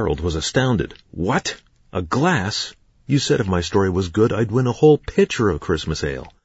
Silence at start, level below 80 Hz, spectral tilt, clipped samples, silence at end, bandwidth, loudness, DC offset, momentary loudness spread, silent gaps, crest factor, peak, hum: 0 s; -38 dBFS; -5.5 dB/octave; under 0.1%; 0.15 s; 8 kHz; -20 LUFS; under 0.1%; 12 LU; none; 18 dB; -2 dBFS; none